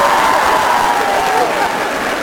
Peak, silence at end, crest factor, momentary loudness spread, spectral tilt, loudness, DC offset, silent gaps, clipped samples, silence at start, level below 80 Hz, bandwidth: 0 dBFS; 0 s; 12 dB; 5 LU; -2.5 dB/octave; -13 LUFS; under 0.1%; none; under 0.1%; 0 s; -42 dBFS; 19 kHz